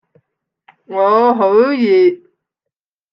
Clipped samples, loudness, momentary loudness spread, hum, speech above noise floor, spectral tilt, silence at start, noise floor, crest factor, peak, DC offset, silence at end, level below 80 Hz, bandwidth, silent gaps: under 0.1%; -12 LUFS; 9 LU; none; 71 dB; -7.5 dB/octave; 0.9 s; -82 dBFS; 14 dB; -2 dBFS; under 0.1%; 0.95 s; -70 dBFS; 5.8 kHz; none